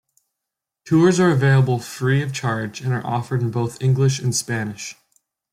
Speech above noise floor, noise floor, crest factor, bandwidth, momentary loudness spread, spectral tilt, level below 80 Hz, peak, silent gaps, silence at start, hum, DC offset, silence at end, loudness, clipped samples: 65 dB; -84 dBFS; 16 dB; 14.5 kHz; 10 LU; -6 dB/octave; -58 dBFS; -4 dBFS; none; 0.85 s; none; under 0.1%; 0.6 s; -20 LUFS; under 0.1%